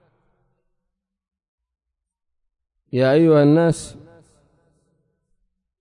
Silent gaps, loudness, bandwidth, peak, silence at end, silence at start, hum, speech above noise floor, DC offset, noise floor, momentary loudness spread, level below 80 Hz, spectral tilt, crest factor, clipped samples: none; -17 LUFS; 11 kHz; -4 dBFS; 1.9 s; 2.95 s; none; 67 dB; under 0.1%; -82 dBFS; 14 LU; -58 dBFS; -7.5 dB/octave; 20 dB; under 0.1%